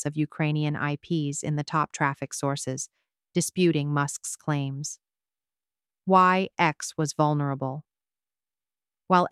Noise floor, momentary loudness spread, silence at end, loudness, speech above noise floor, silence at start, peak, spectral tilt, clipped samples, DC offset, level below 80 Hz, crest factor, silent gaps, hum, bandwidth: under -90 dBFS; 12 LU; 0.05 s; -26 LUFS; over 64 dB; 0 s; -6 dBFS; -5 dB/octave; under 0.1%; under 0.1%; -68 dBFS; 22 dB; none; none; 13.5 kHz